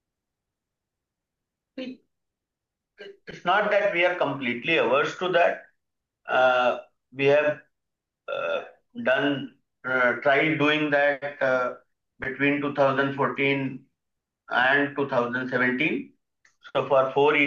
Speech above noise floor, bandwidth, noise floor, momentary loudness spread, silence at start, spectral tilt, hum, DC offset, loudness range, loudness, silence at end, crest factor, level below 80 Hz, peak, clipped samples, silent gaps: 63 dB; 7.2 kHz; -86 dBFS; 17 LU; 1.75 s; -6 dB/octave; none; under 0.1%; 3 LU; -24 LUFS; 0 s; 16 dB; -70 dBFS; -10 dBFS; under 0.1%; none